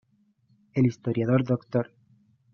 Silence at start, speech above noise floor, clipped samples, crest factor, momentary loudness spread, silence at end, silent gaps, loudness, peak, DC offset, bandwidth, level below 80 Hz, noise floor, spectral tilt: 0.75 s; 41 dB; under 0.1%; 20 dB; 8 LU; 0.7 s; none; -26 LUFS; -8 dBFS; under 0.1%; 6.8 kHz; -64 dBFS; -66 dBFS; -9 dB/octave